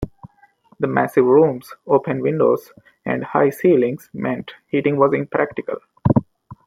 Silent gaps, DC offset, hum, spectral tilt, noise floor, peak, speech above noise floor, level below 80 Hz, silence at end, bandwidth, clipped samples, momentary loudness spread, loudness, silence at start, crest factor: none; under 0.1%; none; -8.5 dB/octave; -54 dBFS; -2 dBFS; 36 dB; -48 dBFS; 0.1 s; 16 kHz; under 0.1%; 12 LU; -19 LUFS; 0 s; 18 dB